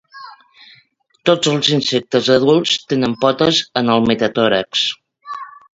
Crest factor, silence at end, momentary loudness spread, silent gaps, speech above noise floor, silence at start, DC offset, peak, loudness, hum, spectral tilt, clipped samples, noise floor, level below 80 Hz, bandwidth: 16 dB; 0.25 s; 13 LU; none; 41 dB; 0.15 s; under 0.1%; 0 dBFS; -15 LUFS; none; -4.5 dB/octave; under 0.1%; -56 dBFS; -54 dBFS; 8 kHz